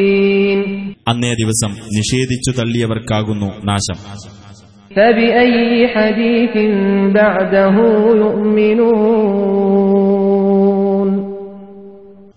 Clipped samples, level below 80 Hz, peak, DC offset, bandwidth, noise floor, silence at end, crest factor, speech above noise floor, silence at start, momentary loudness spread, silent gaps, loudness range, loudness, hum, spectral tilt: under 0.1%; -44 dBFS; 0 dBFS; 0.4%; 11 kHz; -40 dBFS; 0.4 s; 12 dB; 27 dB; 0 s; 9 LU; none; 5 LU; -13 LUFS; none; -5.5 dB/octave